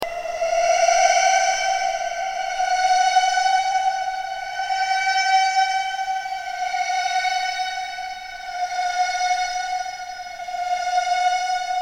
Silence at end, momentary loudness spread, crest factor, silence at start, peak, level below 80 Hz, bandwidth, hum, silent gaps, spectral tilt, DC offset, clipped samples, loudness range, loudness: 0 s; 11 LU; 18 dB; 0 s; -4 dBFS; -54 dBFS; 16 kHz; none; none; 2 dB/octave; under 0.1%; under 0.1%; 6 LU; -21 LUFS